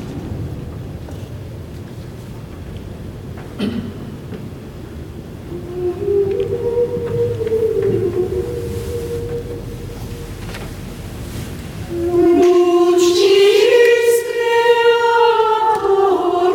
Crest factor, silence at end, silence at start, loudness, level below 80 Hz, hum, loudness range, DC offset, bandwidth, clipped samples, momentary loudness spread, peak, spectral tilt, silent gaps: 14 dB; 0 s; 0 s; -15 LUFS; -38 dBFS; none; 16 LU; under 0.1%; 17.5 kHz; under 0.1%; 20 LU; -2 dBFS; -5.5 dB/octave; none